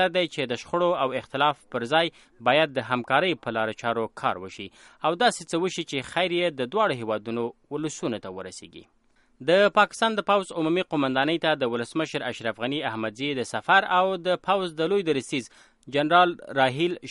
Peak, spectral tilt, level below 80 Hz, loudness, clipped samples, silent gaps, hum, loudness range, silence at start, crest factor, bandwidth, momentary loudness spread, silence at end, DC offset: -4 dBFS; -4.5 dB/octave; -68 dBFS; -25 LUFS; under 0.1%; none; none; 4 LU; 0 s; 20 dB; 11.5 kHz; 11 LU; 0 s; under 0.1%